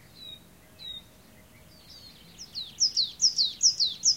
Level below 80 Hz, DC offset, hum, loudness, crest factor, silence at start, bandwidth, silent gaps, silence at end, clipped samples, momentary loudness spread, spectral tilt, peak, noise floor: -64 dBFS; under 0.1%; none; -23 LUFS; 20 dB; 0.15 s; 16 kHz; none; 0 s; under 0.1%; 23 LU; 2 dB/octave; -10 dBFS; -55 dBFS